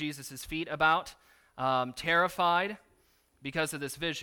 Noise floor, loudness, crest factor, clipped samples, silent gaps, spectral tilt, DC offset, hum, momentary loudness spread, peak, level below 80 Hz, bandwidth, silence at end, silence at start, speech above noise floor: -68 dBFS; -30 LUFS; 20 dB; under 0.1%; none; -3.5 dB/octave; under 0.1%; none; 13 LU; -10 dBFS; -60 dBFS; 19 kHz; 0 s; 0 s; 37 dB